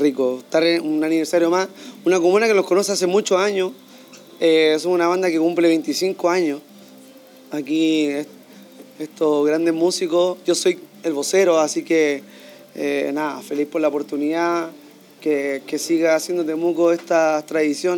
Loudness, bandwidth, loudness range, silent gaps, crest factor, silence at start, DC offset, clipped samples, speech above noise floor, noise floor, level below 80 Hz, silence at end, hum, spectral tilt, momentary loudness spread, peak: -19 LUFS; 18 kHz; 5 LU; none; 14 dB; 0 s; under 0.1%; under 0.1%; 26 dB; -45 dBFS; -86 dBFS; 0 s; none; -4 dB/octave; 9 LU; -6 dBFS